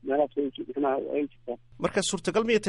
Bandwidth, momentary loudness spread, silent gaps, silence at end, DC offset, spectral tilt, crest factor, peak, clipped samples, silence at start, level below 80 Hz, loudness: 11.5 kHz; 8 LU; none; 0 s; under 0.1%; -4 dB/octave; 16 dB; -12 dBFS; under 0.1%; 0.05 s; -60 dBFS; -29 LUFS